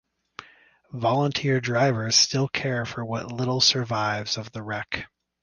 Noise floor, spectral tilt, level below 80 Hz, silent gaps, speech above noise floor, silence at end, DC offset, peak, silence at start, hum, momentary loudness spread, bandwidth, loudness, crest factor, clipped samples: -56 dBFS; -3.5 dB/octave; -58 dBFS; none; 31 dB; 0.35 s; under 0.1%; -6 dBFS; 0.4 s; none; 16 LU; 11 kHz; -24 LUFS; 20 dB; under 0.1%